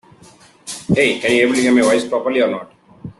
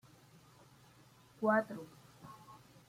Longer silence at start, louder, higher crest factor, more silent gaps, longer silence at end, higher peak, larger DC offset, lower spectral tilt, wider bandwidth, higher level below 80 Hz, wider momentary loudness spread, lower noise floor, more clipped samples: second, 0.65 s vs 1.4 s; first, -15 LUFS vs -35 LUFS; second, 14 dB vs 22 dB; neither; second, 0.1 s vs 0.35 s; first, -2 dBFS vs -20 dBFS; neither; second, -4.5 dB/octave vs -6.5 dB/octave; second, 12.5 kHz vs 16 kHz; first, -54 dBFS vs -80 dBFS; second, 16 LU vs 24 LU; second, -46 dBFS vs -63 dBFS; neither